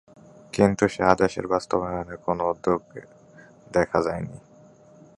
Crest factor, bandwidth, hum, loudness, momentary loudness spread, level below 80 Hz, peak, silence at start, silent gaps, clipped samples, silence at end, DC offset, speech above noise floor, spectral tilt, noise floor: 26 dB; 11.5 kHz; none; -24 LUFS; 13 LU; -50 dBFS; 0 dBFS; 0.55 s; none; under 0.1%; 0.8 s; under 0.1%; 28 dB; -6 dB/octave; -52 dBFS